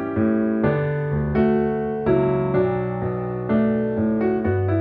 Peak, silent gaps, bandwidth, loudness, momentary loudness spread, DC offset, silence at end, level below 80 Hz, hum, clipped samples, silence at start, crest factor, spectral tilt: -6 dBFS; none; 4.5 kHz; -21 LUFS; 4 LU; under 0.1%; 0 s; -44 dBFS; none; under 0.1%; 0 s; 14 dB; -11.5 dB/octave